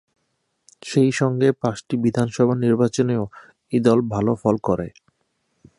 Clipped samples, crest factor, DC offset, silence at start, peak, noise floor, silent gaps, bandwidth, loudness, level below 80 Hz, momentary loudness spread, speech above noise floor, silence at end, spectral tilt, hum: under 0.1%; 18 dB; under 0.1%; 0.85 s; -4 dBFS; -72 dBFS; none; 11 kHz; -20 LUFS; -54 dBFS; 8 LU; 52 dB; 0.9 s; -7 dB/octave; none